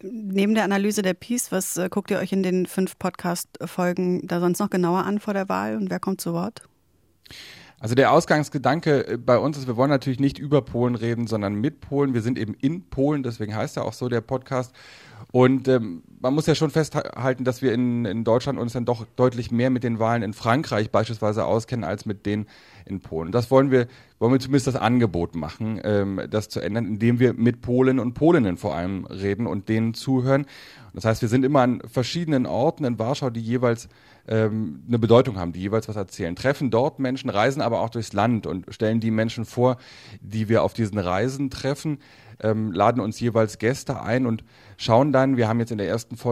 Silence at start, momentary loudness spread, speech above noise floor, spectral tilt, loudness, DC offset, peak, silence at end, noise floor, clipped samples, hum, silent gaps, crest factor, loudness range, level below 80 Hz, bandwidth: 0.05 s; 9 LU; 41 dB; -6.5 dB/octave; -23 LUFS; under 0.1%; -2 dBFS; 0 s; -64 dBFS; under 0.1%; none; none; 22 dB; 3 LU; -54 dBFS; 16 kHz